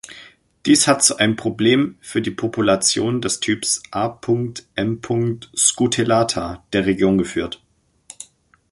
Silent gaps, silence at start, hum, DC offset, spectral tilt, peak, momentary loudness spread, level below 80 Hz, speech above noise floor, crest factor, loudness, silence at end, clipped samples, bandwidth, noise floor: none; 0.1 s; none; under 0.1%; -3.5 dB/octave; 0 dBFS; 12 LU; -50 dBFS; 32 dB; 20 dB; -18 LUFS; 0.5 s; under 0.1%; 11.5 kHz; -51 dBFS